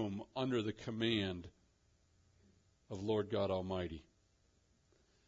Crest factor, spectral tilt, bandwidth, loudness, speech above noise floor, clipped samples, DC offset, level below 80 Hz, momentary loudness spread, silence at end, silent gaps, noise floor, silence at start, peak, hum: 20 dB; -4.5 dB/octave; 7.4 kHz; -39 LUFS; 36 dB; under 0.1%; under 0.1%; -70 dBFS; 14 LU; 1.25 s; none; -74 dBFS; 0 s; -22 dBFS; none